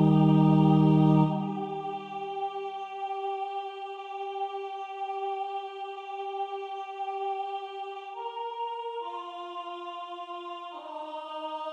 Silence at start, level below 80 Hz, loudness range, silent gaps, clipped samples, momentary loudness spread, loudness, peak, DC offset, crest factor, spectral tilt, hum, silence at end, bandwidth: 0 s; -74 dBFS; 11 LU; none; under 0.1%; 17 LU; -30 LUFS; -12 dBFS; under 0.1%; 18 dB; -9 dB/octave; none; 0 s; 5.4 kHz